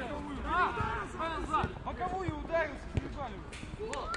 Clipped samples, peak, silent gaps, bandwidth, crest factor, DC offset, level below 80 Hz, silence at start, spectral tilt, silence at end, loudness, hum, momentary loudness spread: under 0.1%; -18 dBFS; none; 11.5 kHz; 18 dB; under 0.1%; -46 dBFS; 0 s; -5.5 dB/octave; 0 s; -35 LUFS; none; 11 LU